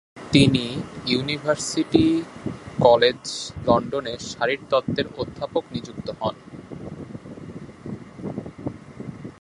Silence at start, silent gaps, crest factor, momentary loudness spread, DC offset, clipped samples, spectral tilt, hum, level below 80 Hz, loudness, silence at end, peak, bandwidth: 0.15 s; none; 24 dB; 20 LU; under 0.1%; under 0.1%; -5 dB/octave; none; -48 dBFS; -23 LUFS; 0.1 s; 0 dBFS; 11.5 kHz